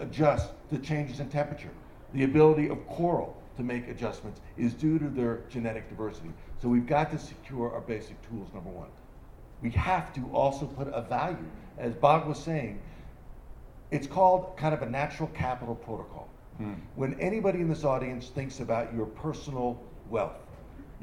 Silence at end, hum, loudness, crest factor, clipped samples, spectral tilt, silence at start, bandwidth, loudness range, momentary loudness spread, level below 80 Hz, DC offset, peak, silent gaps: 0 s; none; -30 LUFS; 24 dB; under 0.1%; -7.5 dB/octave; 0 s; 11 kHz; 5 LU; 19 LU; -48 dBFS; under 0.1%; -6 dBFS; none